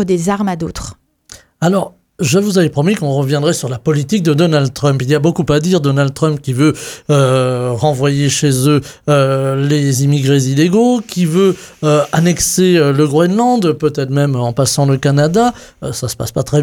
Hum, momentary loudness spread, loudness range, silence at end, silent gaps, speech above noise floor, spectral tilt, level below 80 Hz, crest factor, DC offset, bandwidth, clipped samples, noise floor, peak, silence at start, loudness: none; 6 LU; 2 LU; 0 s; none; 28 dB; -5.5 dB/octave; -42 dBFS; 12 dB; under 0.1%; 16.5 kHz; under 0.1%; -41 dBFS; 0 dBFS; 0 s; -13 LUFS